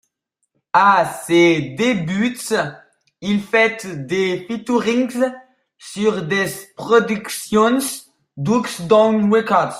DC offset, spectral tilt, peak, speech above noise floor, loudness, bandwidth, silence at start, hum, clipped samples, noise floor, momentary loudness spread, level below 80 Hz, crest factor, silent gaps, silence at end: under 0.1%; -5 dB/octave; -2 dBFS; 56 dB; -18 LUFS; 15.5 kHz; 0.75 s; none; under 0.1%; -73 dBFS; 11 LU; -58 dBFS; 16 dB; none; 0 s